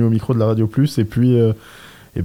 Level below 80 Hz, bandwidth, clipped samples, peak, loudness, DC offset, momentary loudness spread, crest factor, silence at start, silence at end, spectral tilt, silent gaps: -48 dBFS; 16 kHz; under 0.1%; -6 dBFS; -17 LUFS; under 0.1%; 8 LU; 12 dB; 0 s; 0 s; -8.5 dB/octave; none